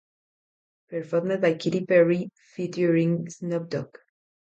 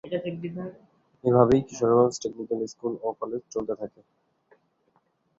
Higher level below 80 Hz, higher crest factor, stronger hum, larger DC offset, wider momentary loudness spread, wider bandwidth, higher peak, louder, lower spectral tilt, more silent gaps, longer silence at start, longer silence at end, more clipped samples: second, -72 dBFS vs -60 dBFS; about the same, 18 dB vs 22 dB; neither; neither; about the same, 15 LU vs 15 LU; about the same, 8 kHz vs 7.8 kHz; about the same, -8 dBFS vs -6 dBFS; about the same, -25 LUFS vs -26 LUFS; about the same, -7 dB/octave vs -7 dB/octave; neither; first, 0.9 s vs 0.05 s; second, 0.75 s vs 1.5 s; neither